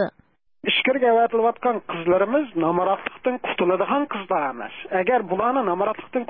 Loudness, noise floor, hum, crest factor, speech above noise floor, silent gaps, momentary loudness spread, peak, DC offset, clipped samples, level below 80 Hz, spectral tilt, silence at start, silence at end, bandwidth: -22 LUFS; -61 dBFS; none; 16 dB; 39 dB; none; 8 LU; -6 dBFS; 0.2%; under 0.1%; -62 dBFS; -10 dB/octave; 0 s; 0.05 s; 4.6 kHz